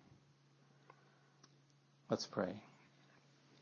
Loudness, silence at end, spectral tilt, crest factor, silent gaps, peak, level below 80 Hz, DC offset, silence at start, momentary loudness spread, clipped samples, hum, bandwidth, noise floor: -43 LUFS; 0.9 s; -4.5 dB/octave; 26 dB; none; -22 dBFS; under -90 dBFS; under 0.1%; 2.1 s; 27 LU; under 0.1%; none; 7 kHz; -71 dBFS